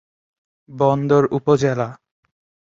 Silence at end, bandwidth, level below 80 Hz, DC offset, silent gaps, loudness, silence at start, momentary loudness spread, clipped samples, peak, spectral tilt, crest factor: 0.75 s; 7.6 kHz; -58 dBFS; under 0.1%; none; -18 LUFS; 0.7 s; 8 LU; under 0.1%; -2 dBFS; -7.5 dB/octave; 18 dB